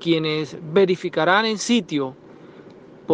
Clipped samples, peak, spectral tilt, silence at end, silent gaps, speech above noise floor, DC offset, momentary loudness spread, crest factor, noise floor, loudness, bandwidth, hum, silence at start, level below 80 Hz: under 0.1%; -4 dBFS; -4.5 dB/octave; 0 s; none; 24 dB; under 0.1%; 9 LU; 18 dB; -44 dBFS; -21 LUFS; 9.6 kHz; none; 0 s; -68 dBFS